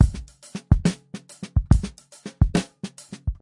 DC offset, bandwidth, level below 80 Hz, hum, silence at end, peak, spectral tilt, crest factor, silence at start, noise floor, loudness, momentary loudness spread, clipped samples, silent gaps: under 0.1%; 11.5 kHz; -28 dBFS; none; 0.05 s; 0 dBFS; -6.5 dB/octave; 22 dB; 0 s; -42 dBFS; -24 LUFS; 18 LU; under 0.1%; none